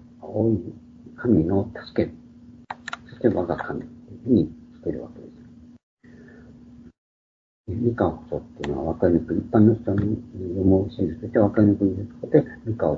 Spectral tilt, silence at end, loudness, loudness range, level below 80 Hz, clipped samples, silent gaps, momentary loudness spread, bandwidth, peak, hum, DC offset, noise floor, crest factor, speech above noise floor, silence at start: -10 dB/octave; 0 s; -23 LUFS; 10 LU; -48 dBFS; under 0.1%; 5.83-5.97 s, 6.98-7.64 s; 17 LU; 7.6 kHz; -2 dBFS; none; under 0.1%; -47 dBFS; 22 dB; 25 dB; 0.2 s